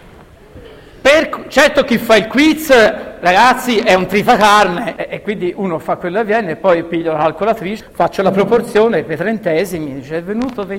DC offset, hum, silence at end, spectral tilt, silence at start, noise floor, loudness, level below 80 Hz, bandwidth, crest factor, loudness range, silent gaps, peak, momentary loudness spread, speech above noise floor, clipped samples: under 0.1%; none; 0 s; -4.5 dB/octave; 0.05 s; -40 dBFS; -13 LUFS; -42 dBFS; 17 kHz; 14 dB; 5 LU; none; 0 dBFS; 11 LU; 26 dB; 0.1%